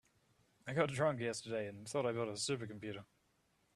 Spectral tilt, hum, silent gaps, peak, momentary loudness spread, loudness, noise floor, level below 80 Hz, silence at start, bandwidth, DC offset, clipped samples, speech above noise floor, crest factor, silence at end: -4.5 dB/octave; none; none; -18 dBFS; 12 LU; -39 LUFS; -77 dBFS; -76 dBFS; 0.65 s; 13 kHz; under 0.1%; under 0.1%; 38 dB; 24 dB; 0.7 s